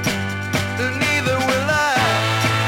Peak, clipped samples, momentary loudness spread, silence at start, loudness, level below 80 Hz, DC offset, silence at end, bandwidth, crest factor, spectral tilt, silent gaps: -6 dBFS; under 0.1%; 5 LU; 0 s; -18 LUFS; -46 dBFS; under 0.1%; 0 s; 17 kHz; 12 dB; -4 dB/octave; none